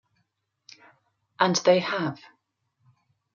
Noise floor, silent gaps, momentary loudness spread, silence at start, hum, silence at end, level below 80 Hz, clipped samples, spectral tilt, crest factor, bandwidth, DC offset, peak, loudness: -76 dBFS; none; 12 LU; 1.4 s; none; 1.2 s; -76 dBFS; under 0.1%; -4 dB/octave; 22 dB; 7.2 kHz; under 0.1%; -6 dBFS; -24 LUFS